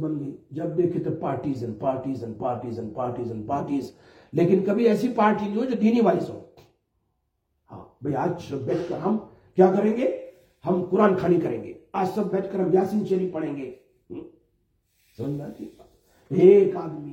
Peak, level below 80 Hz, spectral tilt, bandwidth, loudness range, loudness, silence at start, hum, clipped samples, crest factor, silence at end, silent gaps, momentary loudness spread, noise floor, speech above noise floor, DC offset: -4 dBFS; -62 dBFS; -8.5 dB/octave; 8.6 kHz; 6 LU; -24 LUFS; 0 s; none; under 0.1%; 20 dB; 0 s; none; 15 LU; -75 dBFS; 51 dB; under 0.1%